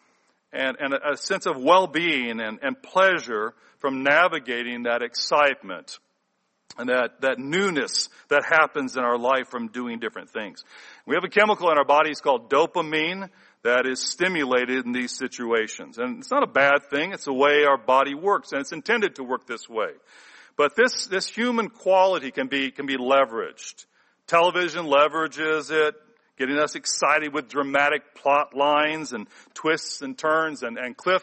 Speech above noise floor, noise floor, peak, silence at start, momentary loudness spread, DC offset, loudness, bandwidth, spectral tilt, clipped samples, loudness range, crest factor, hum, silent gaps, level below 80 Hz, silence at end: 50 dB; -73 dBFS; -4 dBFS; 0.55 s; 13 LU; under 0.1%; -23 LUFS; 8.8 kHz; -3 dB/octave; under 0.1%; 3 LU; 20 dB; none; none; -74 dBFS; 0 s